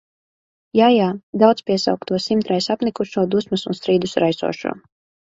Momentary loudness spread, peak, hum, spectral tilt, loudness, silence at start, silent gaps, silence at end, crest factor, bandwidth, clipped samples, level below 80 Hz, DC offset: 9 LU; 0 dBFS; none; -6 dB/octave; -19 LUFS; 0.75 s; 1.23-1.33 s; 0.45 s; 18 dB; 7.8 kHz; under 0.1%; -60 dBFS; under 0.1%